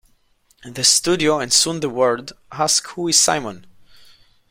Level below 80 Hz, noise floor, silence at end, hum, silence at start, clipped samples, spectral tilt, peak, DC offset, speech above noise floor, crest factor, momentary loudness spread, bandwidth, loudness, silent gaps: -58 dBFS; -59 dBFS; 0.9 s; none; 0.65 s; under 0.1%; -1.5 dB/octave; -2 dBFS; under 0.1%; 40 dB; 20 dB; 13 LU; 16.5 kHz; -17 LUFS; none